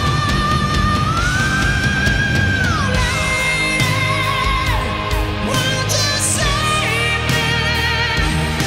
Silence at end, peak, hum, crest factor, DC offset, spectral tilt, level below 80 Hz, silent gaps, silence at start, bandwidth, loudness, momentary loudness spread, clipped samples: 0 s; -4 dBFS; none; 14 dB; under 0.1%; -3.5 dB/octave; -26 dBFS; none; 0 s; 16.5 kHz; -16 LUFS; 2 LU; under 0.1%